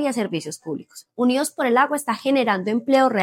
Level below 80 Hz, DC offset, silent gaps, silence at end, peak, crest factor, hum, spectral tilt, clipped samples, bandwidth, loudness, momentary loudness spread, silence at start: -82 dBFS; under 0.1%; none; 0 s; -4 dBFS; 16 dB; none; -4.5 dB/octave; under 0.1%; 16.5 kHz; -21 LUFS; 13 LU; 0 s